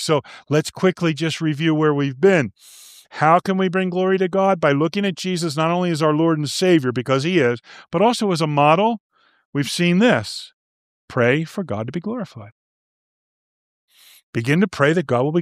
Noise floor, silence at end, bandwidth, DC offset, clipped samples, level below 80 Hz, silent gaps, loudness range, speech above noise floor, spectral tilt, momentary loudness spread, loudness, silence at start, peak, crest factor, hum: under -90 dBFS; 0 s; 15 kHz; under 0.1%; under 0.1%; -64 dBFS; 9.00-9.10 s, 9.45-9.53 s, 10.54-11.08 s, 12.52-13.88 s, 14.23-14.33 s; 7 LU; over 71 dB; -6 dB/octave; 11 LU; -19 LUFS; 0 s; -2 dBFS; 18 dB; none